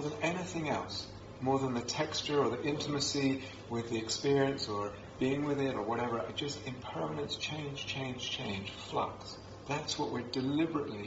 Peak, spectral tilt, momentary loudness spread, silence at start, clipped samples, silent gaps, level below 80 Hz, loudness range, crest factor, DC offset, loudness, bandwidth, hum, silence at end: -18 dBFS; -4 dB/octave; 9 LU; 0 s; under 0.1%; none; -62 dBFS; 4 LU; 18 dB; under 0.1%; -35 LUFS; 7.6 kHz; none; 0 s